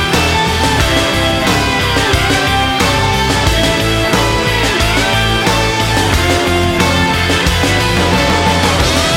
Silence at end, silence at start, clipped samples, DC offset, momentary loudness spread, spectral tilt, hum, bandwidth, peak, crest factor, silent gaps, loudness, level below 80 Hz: 0 s; 0 s; under 0.1%; under 0.1%; 1 LU; -4 dB/octave; none; 16.5 kHz; 0 dBFS; 12 dB; none; -12 LUFS; -22 dBFS